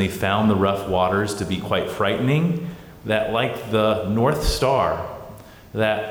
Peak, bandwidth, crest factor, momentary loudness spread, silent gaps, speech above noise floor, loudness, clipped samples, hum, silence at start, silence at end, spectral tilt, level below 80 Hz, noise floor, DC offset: -8 dBFS; over 20 kHz; 14 dB; 11 LU; none; 20 dB; -21 LUFS; under 0.1%; none; 0 s; 0 s; -6 dB/octave; -38 dBFS; -41 dBFS; under 0.1%